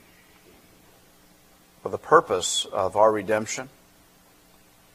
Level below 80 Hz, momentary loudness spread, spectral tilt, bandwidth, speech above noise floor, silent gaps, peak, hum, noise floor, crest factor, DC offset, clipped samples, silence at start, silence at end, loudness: -64 dBFS; 15 LU; -2.5 dB/octave; 15.5 kHz; 34 dB; none; -2 dBFS; none; -56 dBFS; 26 dB; under 0.1%; under 0.1%; 1.85 s; 1.25 s; -23 LUFS